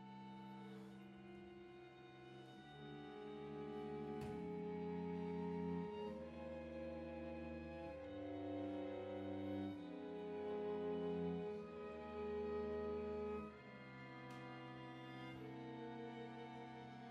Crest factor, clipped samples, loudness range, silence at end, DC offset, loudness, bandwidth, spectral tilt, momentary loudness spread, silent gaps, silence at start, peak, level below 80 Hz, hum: 14 dB; under 0.1%; 7 LU; 0 s; under 0.1%; -50 LUFS; 10 kHz; -8 dB/octave; 12 LU; none; 0 s; -34 dBFS; -70 dBFS; none